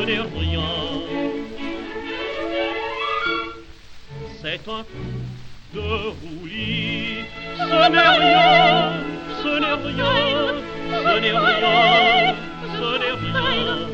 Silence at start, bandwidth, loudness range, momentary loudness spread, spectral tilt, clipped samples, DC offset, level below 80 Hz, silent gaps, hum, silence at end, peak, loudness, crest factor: 0 s; 7.8 kHz; 11 LU; 18 LU; -5.5 dB/octave; under 0.1%; under 0.1%; -42 dBFS; none; none; 0 s; -2 dBFS; -19 LUFS; 18 dB